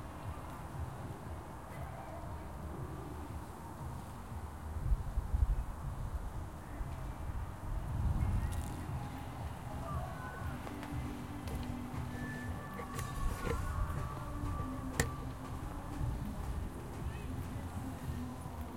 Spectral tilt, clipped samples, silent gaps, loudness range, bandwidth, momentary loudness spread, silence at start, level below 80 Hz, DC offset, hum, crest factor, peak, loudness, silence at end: -6 dB/octave; under 0.1%; none; 5 LU; 16.5 kHz; 9 LU; 0 s; -44 dBFS; 0.1%; none; 26 dB; -14 dBFS; -42 LUFS; 0 s